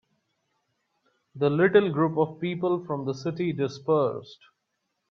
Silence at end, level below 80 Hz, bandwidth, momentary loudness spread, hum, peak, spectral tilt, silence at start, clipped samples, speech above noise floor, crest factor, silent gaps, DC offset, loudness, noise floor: 0.75 s; -70 dBFS; 6.8 kHz; 9 LU; none; -8 dBFS; -7.5 dB/octave; 1.35 s; under 0.1%; 54 dB; 20 dB; none; under 0.1%; -26 LUFS; -79 dBFS